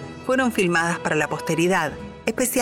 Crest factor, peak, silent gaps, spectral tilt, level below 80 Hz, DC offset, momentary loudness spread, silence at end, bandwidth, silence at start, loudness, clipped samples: 18 dB; -4 dBFS; none; -4 dB/octave; -52 dBFS; under 0.1%; 7 LU; 0 s; 19.5 kHz; 0 s; -22 LUFS; under 0.1%